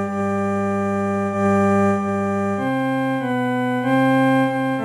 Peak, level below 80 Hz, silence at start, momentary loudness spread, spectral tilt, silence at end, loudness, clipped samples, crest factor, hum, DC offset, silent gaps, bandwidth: -8 dBFS; -60 dBFS; 0 s; 5 LU; -7.5 dB/octave; 0 s; -20 LUFS; under 0.1%; 12 dB; none; under 0.1%; none; 13.5 kHz